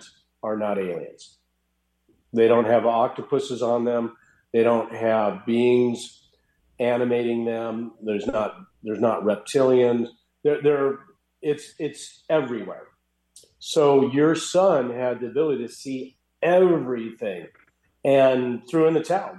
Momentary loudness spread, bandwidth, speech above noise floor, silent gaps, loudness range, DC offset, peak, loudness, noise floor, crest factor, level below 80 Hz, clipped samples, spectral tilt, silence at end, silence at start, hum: 15 LU; 12.5 kHz; 51 dB; none; 4 LU; under 0.1%; -6 dBFS; -23 LUFS; -72 dBFS; 16 dB; -66 dBFS; under 0.1%; -6 dB/octave; 0 s; 0.45 s; none